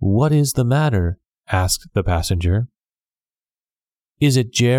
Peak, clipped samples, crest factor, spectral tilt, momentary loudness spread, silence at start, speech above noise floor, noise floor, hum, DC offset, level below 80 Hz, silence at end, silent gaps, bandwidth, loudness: -4 dBFS; under 0.1%; 16 dB; -5.5 dB/octave; 7 LU; 0 s; over 73 dB; under -90 dBFS; none; under 0.1%; -34 dBFS; 0 s; none; 17 kHz; -19 LUFS